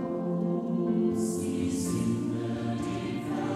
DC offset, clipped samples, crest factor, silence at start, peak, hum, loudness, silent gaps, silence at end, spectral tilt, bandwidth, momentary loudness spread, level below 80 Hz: under 0.1%; under 0.1%; 12 dB; 0 s; -16 dBFS; none; -30 LUFS; none; 0 s; -6.5 dB/octave; 14.5 kHz; 5 LU; -58 dBFS